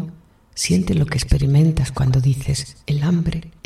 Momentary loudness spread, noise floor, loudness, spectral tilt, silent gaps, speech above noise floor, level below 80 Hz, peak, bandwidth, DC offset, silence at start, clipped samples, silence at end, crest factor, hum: 9 LU; -42 dBFS; -19 LUFS; -6 dB/octave; none; 24 dB; -32 dBFS; -2 dBFS; 14 kHz; under 0.1%; 0 s; under 0.1%; 0.15 s; 16 dB; none